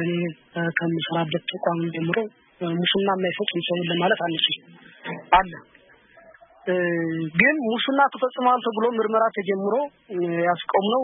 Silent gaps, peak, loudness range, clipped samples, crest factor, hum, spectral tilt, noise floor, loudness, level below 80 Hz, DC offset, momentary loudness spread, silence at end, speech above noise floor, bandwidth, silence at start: none; -2 dBFS; 3 LU; under 0.1%; 20 dB; none; -10 dB/octave; -53 dBFS; -23 LUFS; -56 dBFS; under 0.1%; 10 LU; 0 s; 30 dB; 4 kHz; 0 s